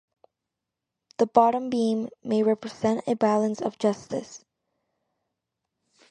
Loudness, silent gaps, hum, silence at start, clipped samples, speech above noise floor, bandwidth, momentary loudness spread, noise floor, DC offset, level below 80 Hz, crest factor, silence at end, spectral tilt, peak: -25 LUFS; none; none; 1.2 s; under 0.1%; 61 dB; 9.4 kHz; 13 LU; -85 dBFS; under 0.1%; -70 dBFS; 24 dB; 1.75 s; -6 dB/octave; -4 dBFS